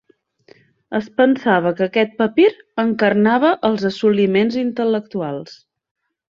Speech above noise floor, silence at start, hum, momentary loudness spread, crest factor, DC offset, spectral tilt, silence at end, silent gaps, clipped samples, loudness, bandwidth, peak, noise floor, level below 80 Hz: 35 dB; 0.9 s; none; 11 LU; 16 dB; under 0.1%; -7 dB/octave; 0.75 s; none; under 0.1%; -17 LUFS; 7.2 kHz; -2 dBFS; -52 dBFS; -62 dBFS